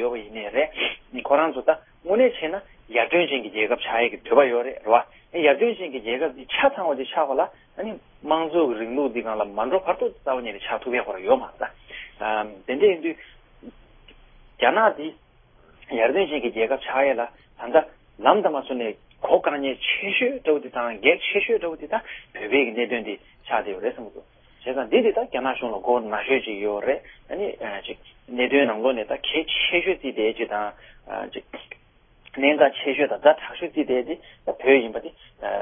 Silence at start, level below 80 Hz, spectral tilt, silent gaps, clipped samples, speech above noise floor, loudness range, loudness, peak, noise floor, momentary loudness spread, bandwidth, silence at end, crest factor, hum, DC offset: 0 s; -58 dBFS; -8.5 dB/octave; none; under 0.1%; 32 dB; 4 LU; -23 LUFS; -2 dBFS; -55 dBFS; 14 LU; 3.7 kHz; 0 s; 22 dB; none; under 0.1%